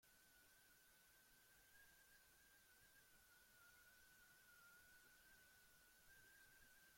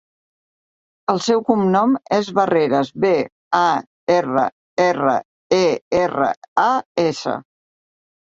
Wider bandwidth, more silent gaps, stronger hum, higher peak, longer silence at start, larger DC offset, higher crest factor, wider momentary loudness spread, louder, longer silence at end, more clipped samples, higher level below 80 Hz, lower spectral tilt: first, 16.5 kHz vs 8 kHz; second, none vs 3.32-3.51 s, 3.87-4.07 s, 4.52-4.77 s, 5.25-5.50 s, 5.81-5.91 s, 6.37-6.42 s, 6.48-6.56 s, 6.85-6.95 s; neither; second, -58 dBFS vs -2 dBFS; second, 0 s vs 1.1 s; neither; about the same, 14 dB vs 16 dB; second, 2 LU vs 6 LU; second, -69 LUFS vs -19 LUFS; second, 0 s vs 0.85 s; neither; second, -86 dBFS vs -60 dBFS; second, -1 dB/octave vs -5.5 dB/octave